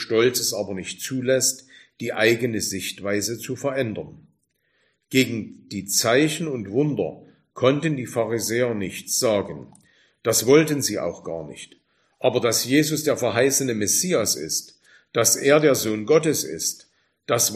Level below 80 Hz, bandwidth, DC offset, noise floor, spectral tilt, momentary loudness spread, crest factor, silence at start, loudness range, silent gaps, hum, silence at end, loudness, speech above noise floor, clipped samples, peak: -62 dBFS; 15.5 kHz; under 0.1%; -69 dBFS; -3.5 dB/octave; 14 LU; 20 dB; 0 s; 5 LU; none; none; 0 s; -22 LUFS; 47 dB; under 0.1%; -4 dBFS